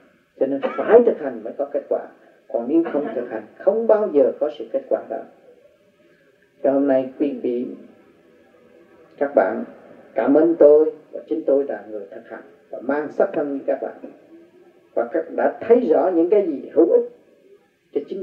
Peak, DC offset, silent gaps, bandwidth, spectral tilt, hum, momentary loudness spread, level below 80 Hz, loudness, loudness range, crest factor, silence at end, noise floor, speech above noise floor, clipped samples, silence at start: 0 dBFS; under 0.1%; none; 4.3 kHz; -9 dB/octave; none; 17 LU; -76 dBFS; -20 LUFS; 6 LU; 20 dB; 0 s; -57 dBFS; 37 dB; under 0.1%; 0.4 s